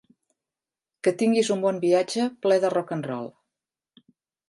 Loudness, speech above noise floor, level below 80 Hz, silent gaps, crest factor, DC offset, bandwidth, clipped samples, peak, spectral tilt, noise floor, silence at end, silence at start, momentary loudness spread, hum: -24 LUFS; over 67 dB; -78 dBFS; none; 18 dB; under 0.1%; 11.5 kHz; under 0.1%; -8 dBFS; -5 dB/octave; under -90 dBFS; 1.2 s; 1.05 s; 10 LU; none